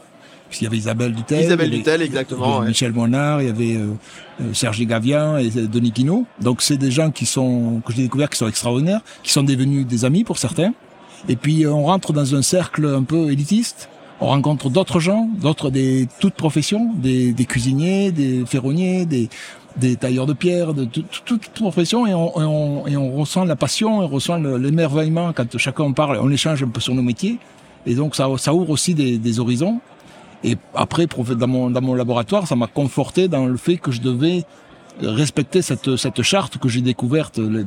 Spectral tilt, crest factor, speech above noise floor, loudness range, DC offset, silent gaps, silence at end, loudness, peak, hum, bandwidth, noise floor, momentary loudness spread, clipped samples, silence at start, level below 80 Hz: -5.5 dB/octave; 18 dB; 27 dB; 2 LU; under 0.1%; none; 0 s; -19 LUFS; 0 dBFS; none; 16 kHz; -45 dBFS; 6 LU; under 0.1%; 0.3 s; -54 dBFS